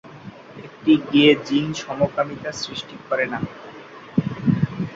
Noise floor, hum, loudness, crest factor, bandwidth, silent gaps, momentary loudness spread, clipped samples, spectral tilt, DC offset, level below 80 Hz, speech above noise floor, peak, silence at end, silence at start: -40 dBFS; none; -21 LUFS; 18 dB; 7.8 kHz; none; 25 LU; under 0.1%; -6 dB/octave; under 0.1%; -54 dBFS; 20 dB; -2 dBFS; 0 s; 0.05 s